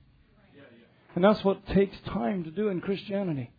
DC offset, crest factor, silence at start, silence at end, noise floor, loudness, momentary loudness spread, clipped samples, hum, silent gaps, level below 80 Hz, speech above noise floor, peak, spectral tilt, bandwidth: under 0.1%; 20 dB; 0.55 s; 0.1 s; -60 dBFS; -28 LUFS; 8 LU; under 0.1%; none; none; -52 dBFS; 33 dB; -8 dBFS; -9.5 dB/octave; 5 kHz